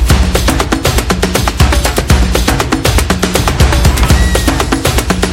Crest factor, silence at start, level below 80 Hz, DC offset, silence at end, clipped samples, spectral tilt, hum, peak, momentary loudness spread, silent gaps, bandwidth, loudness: 10 dB; 0 s; -14 dBFS; 0.2%; 0 s; under 0.1%; -4.5 dB/octave; none; 0 dBFS; 3 LU; none; 17 kHz; -11 LUFS